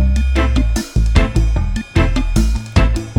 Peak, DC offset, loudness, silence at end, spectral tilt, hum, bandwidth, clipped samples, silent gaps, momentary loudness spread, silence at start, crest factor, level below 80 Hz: 0 dBFS; under 0.1%; -17 LUFS; 0 s; -6 dB/octave; none; 12.5 kHz; under 0.1%; none; 3 LU; 0 s; 14 dB; -16 dBFS